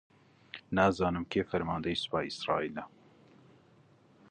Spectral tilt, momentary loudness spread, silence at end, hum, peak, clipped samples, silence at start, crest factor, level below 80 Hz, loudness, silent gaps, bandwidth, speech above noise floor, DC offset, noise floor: -6 dB/octave; 18 LU; 1.45 s; none; -12 dBFS; under 0.1%; 0.55 s; 22 dB; -56 dBFS; -32 LUFS; none; 9.6 kHz; 31 dB; under 0.1%; -63 dBFS